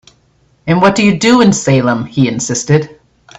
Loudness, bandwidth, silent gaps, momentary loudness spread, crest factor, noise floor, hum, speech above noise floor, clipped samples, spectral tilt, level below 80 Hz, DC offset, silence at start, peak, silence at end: -11 LUFS; 8.4 kHz; none; 7 LU; 12 dB; -53 dBFS; none; 42 dB; under 0.1%; -5 dB/octave; -46 dBFS; under 0.1%; 0.65 s; 0 dBFS; 0.45 s